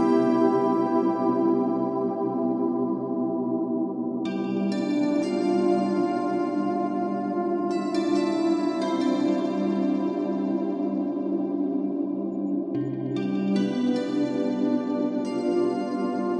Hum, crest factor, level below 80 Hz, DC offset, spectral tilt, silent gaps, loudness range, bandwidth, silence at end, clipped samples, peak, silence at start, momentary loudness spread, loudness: none; 14 dB; -76 dBFS; under 0.1%; -7.5 dB/octave; none; 2 LU; 9.2 kHz; 0 s; under 0.1%; -10 dBFS; 0 s; 5 LU; -25 LUFS